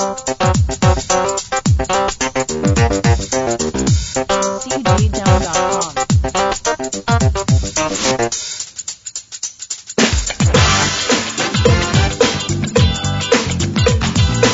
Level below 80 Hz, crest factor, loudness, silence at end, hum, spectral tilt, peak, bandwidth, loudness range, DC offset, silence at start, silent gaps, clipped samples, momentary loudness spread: -26 dBFS; 16 dB; -16 LUFS; 0 s; none; -4 dB/octave; 0 dBFS; 8 kHz; 3 LU; under 0.1%; 0 s; none; under 0.1%; 7 LU